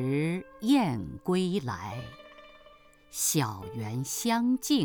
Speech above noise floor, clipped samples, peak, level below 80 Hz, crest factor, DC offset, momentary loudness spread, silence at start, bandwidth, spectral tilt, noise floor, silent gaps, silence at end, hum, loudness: 28 dB; under 0.1%; -14 dBFS; -60 dBFS; 16 dB; under 0.1%; 14 LU; 0 s; over 20 kHz; -4.5 dB/octave; -56 dBFS; none; 0 s; none; -29 LUFS